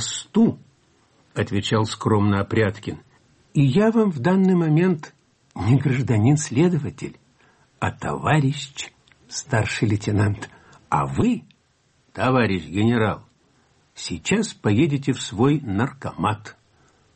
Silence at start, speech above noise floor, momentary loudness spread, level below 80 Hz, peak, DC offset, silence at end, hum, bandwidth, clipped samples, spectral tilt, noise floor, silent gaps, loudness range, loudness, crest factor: 0 s; 43 dB; 14 LU; -52 dBFS; -8 dBFS; under 0.1%; 0.65 s; none; 8.8 kHz; under 0.1%; -6 dB/octave; -63 dBFS; none; 4 LU; -21 LUFS; 14 dB